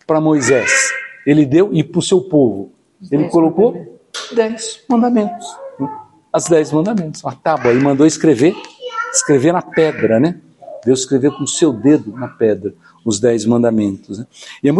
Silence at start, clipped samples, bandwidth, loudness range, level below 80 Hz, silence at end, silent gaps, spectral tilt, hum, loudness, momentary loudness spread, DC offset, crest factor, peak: 0.1 s; under 0.1%; 11.5 kHz; 3 LU; -58 dBFS; 0 s; none; -5 dB/octave; none; -15 LUFS; 15 LU; under 0.1%; 14 dB; 0 dBFS